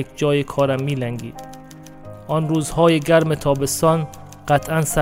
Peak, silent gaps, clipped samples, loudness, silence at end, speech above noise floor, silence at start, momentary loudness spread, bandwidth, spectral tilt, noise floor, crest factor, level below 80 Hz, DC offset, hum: -4 dBFS; none; under 0.1%; -19 LUFS; 0 s; 21 dB; 0 s; 21 LU; 16 kHz; -5.5 dB/octave; -39 dBFS; 16 dB; -44 dBFS; under 0.1%; none